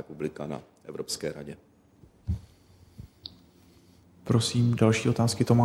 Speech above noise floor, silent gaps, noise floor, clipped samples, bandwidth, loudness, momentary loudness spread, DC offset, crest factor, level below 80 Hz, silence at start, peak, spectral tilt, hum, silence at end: 32 dB; none; -58 dBFS; under 0.1%; 13.5 kHz; -28 LUFS; 22 LU; under 0.1%; 22 dB; -50 dBFS; 0.1 s; -8 dBFS; -6 dB/octave; none; 0 s